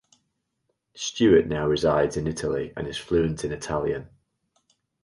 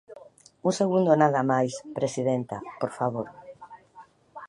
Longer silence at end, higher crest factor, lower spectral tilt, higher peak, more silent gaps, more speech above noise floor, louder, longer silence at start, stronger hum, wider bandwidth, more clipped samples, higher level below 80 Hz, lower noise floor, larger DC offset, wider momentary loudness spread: first, 0.95 s vs 0 s; about the same, 18 dB vs 22 dB; about the same, -5.5 dB/octave vs -6.5 dB/octave; about the same, -6 dBFS vs -6 dBFS; neither; first, 53 dB vs 28 dB; about the same, -25 LUFS vs -26 LUFS; first, 0.95 s vs 0.1 s; neither; about the same, 11.5 kHz vs 11.5 kHz; neither; first, -46 dBFS vs -68 dBFS; first, -76 dBFS vs -53 dBFS; neither; about the same, 13 LU vs 15 LU